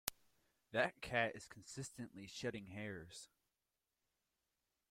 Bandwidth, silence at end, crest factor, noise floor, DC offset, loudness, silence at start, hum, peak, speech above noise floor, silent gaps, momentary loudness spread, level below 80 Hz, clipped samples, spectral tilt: 16.5 kHz; 1.65 s; 36 dB; under -90 dBFS; under 0.1%; -44 LUFS; 0.05 s; none; -10 dBFS; over 45 dB; none; 16 LU; -74 dBFS; under 0.1%; -3.5 dB/octave